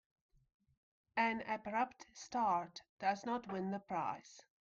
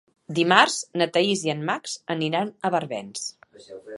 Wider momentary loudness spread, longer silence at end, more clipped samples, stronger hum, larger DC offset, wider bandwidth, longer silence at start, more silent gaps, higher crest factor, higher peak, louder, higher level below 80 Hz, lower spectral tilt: second, 12 LU vs 15 LU; first, 0.2 s vs 0 s; neither; neither; neither; second, 7.6 kHz vs 11.5 kHz; first, 1.15 s vs 0.3 s; first, 2.89-2.97 s vs none; second, 18 dB vs 24 dB; second, -24 dBFS vs 0 dBFS; second, -40 LUFS vs -23 LUFS; about the same, -78 dBFS vs -74 dBFS; first, -5 dB/octave vs -3.5 dB/octave